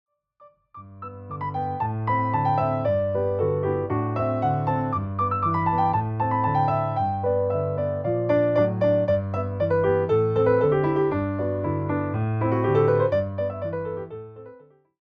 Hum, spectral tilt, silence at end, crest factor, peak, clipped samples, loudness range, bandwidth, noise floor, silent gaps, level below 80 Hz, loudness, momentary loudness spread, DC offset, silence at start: none; -10.5 dB/octave; 0.5 s; 14 dB; -10 dBFS; under 0.1%; 3 LU; 5.4 kHz; -56 dBFS; none; -54 dBFS; -24 LUFS; 9 LU; under 0.1%; 0.4 s